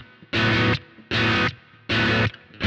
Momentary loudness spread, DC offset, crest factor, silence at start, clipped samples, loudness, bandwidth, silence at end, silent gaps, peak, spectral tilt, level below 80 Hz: 8 LU; under 0.1%; 14 dB; 0 s; under 0.1%; -22 LUFS; 8.2 kHz; 0 s; none; -10 dBFS; -5.5 dB/octave; -44 dBFS